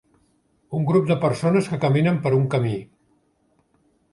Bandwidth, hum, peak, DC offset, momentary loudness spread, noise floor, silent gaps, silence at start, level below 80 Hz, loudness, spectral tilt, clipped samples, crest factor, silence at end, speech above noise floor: 11.5 kHz; none; -6 dBFS; under 0.1%; 7 LU; -65 dBFS; none; 0.7 s; -58 dBFS; -21 LUFS; -8 dB/octave; under 0.1%; 16 dB; 1.25 s; 45 dB